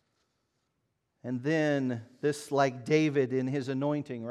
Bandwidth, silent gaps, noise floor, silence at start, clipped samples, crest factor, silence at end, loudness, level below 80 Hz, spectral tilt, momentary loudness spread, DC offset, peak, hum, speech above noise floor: 13 kHz; none; -79 dBFS; 1.25 s; under 0.1%; 18 dB; 0 s; -30 LUFS; -82 dBFS; -6.5 dB/octave; 8 LU; under 0.1%; -12 dBFS; none; 50 dB